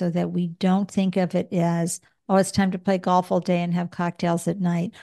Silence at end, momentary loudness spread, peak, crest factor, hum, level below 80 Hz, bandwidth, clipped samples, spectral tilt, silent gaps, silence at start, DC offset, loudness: 0 s; 5 LU; -6 dBFS; 16 dB; none; -60 dBFS; 12.5 kHz; under 0.1%; -6.5 dB/octave; none; 0 s; under 0.1%; -23 LUFS